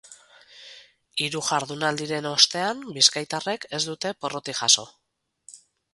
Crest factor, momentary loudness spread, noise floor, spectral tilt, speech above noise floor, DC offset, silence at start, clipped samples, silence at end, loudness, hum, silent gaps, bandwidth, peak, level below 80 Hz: 26 dB; 11 LU; -55 dBFS; -1.5 dB/octave; 30 dB; under 0.1%; 0.05 s; under 0.1%; 0.35 s; -23 LUFS; none; none; 12 kHz; -2 dBFS; -70 dBFS